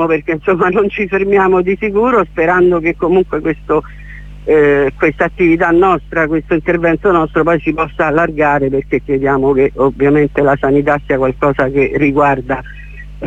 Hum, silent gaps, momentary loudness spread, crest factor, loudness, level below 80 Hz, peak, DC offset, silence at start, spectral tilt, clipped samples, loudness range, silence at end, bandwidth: 50 Hz at -35 dBFS; none; 6 LU; 12 dB; -13 LUFS; -34 dBFS; 0 dBFS; under 0.1%; 0 s; -8.5 dB/octave; under 0.1%; 1 LU; 0 s; 7.8 kHz